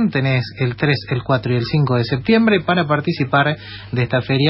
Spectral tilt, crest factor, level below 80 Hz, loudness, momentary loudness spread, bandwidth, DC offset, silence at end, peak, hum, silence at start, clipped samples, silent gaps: -9.5 dB/octave; 14 dB; -48 dBFS; -18 LUFS; 5 LU; 5.8 kHz; under 0.1%; 0 s; -2 dBFS; none; 0 s; under 0.1%; none